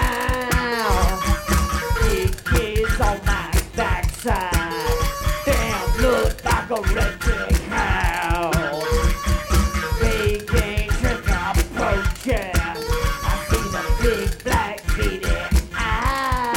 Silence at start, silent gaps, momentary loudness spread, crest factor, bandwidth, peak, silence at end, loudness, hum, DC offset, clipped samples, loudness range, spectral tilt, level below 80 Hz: 0 s; none; 3 LU; 16 dB; 17.5 kHz; -4 dBFS; 0 s; -22 LUFS; none; under 0.1%; under 0.1%; 1 LU; -4.5 dB/octave; -24 dBFS